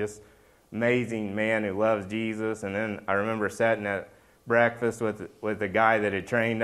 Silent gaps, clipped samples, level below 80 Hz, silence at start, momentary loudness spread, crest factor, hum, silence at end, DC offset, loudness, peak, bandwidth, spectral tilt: none; under 0.1%; -64 dBFS; 0 s; 9 LU; 20 dB; none; 0 s; under 0.1%; -27 LUFS; -6 dBFS; 13 kHz; -6 dB/octave